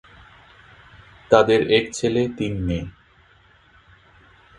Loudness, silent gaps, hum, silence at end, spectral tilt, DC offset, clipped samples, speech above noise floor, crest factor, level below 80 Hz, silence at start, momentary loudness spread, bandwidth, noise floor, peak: -20 LUFS; none; none; 1.7 s; -5.5 dB/octave; under 0.1%; under 0.1%; 35 dB; 24 dB; -44 dBFS; 1.3 s; 12 LU; 11 kHz; -54 dBFS; 0 dBFS